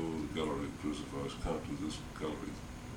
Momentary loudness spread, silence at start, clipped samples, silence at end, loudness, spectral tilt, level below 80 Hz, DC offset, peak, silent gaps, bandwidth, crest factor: 5 LU; 0 s; under 0.1%; 0 s; -40 LUFS; -5.5 dB/octave; -50 dBFS; under 0.1%; -24 dBFS; none; 18.5 kHz; 16 dB